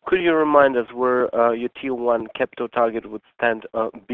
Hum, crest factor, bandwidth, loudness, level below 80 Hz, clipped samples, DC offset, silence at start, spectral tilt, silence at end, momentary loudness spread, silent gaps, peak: none; 20 dB; 4.2 kHz; -21 LUFS; -58 dBFS; under 0.1%; under 0.1%; 0.05 s; -8 dB/octave; 0 s; 10 LU; none; 0 dBFS